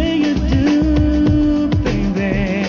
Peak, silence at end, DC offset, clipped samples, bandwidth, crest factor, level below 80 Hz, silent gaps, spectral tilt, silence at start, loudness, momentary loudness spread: -4 dBFS; 0 s; under 0.1%; under 0.1%; 7.2 kHz; 10 dB; -22 dBFS; none; -7.5 dB/octave; 0 s; -16 LUFS; 4 LU